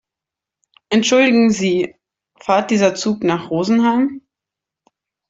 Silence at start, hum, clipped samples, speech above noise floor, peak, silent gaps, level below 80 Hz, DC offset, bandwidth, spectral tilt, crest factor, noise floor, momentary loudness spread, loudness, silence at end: 0.9 s; none; under 0.1%; 71 dB; -2 dBFS; none; -60 dBFS; under 0.1%; 7.8 kHz; -4.5 dB/octave; 16 dB; -86 dBFS; 9 LU; -16 LUFS; 1.1 s